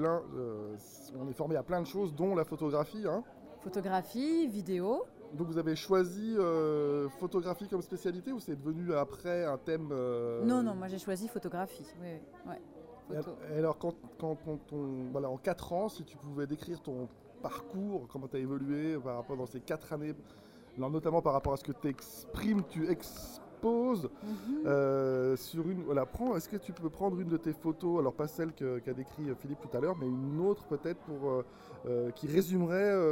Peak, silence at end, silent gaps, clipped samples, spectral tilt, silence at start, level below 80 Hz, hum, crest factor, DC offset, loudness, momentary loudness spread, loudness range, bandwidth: -16 dBFS; 0 s; none; under 0.1%; -7 dB/octave; 0 s; -62 dBFS; none; 20 dB; under 0.1%; -35 LUFS; 12 LU; 6 LU; 16 kHz